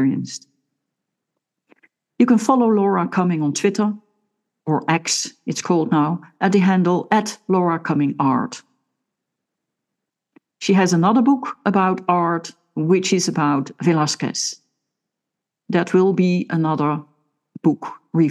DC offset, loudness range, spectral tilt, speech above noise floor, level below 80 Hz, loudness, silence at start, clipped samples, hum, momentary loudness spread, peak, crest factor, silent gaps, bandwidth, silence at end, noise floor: under 0.1%; 3 LU; -5.5 dB/octave; 65 dB; -76 dBFS; -19 LUFS; 0 s; under 0.1%; none; 10 LU; -2 dBFS; 18 dB; none; 12.5 kHz; 0 s; -83 dBFS